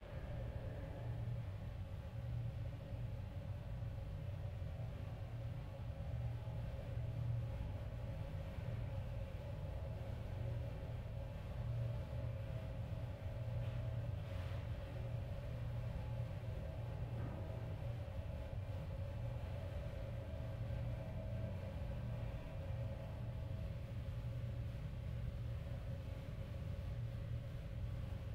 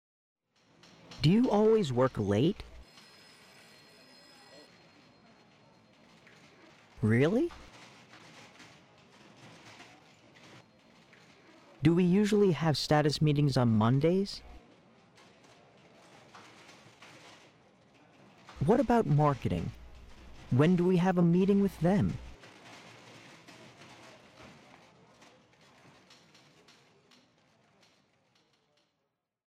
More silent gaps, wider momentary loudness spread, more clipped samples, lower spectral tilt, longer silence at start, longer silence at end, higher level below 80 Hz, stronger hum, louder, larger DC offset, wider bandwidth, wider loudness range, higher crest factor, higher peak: neither; second, 4 LU vs 27 LU; neither; about the same, -8 dB/octave vs -7.5 dB/octave; second, 0 s vs 1.1 s; second, 0 s vs 5.05 s; about the same, -52 dBFS vs -56 dBFS; neither; second, -47 LUFS vs -28 LUFS; neither; second, 10 kHz vs 13.5 kHz; second, 2 LU vs 9 LU; second, 12 dB vs 20 dB; second, -32 dBFS vs -12 dBFS